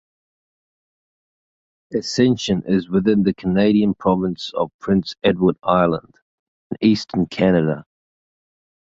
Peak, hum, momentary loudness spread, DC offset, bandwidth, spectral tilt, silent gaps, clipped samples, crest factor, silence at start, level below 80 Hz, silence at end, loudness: -2 dBFS; none; 8 LU; under 0.1%; 7.8 kHz; -6.5 dB/octave; 4.74-4.79 s, 6.22-6.70 s; under 0.1%; 18 dB; 1.9 s; -50 dBFS; 1 s; -19 LUFS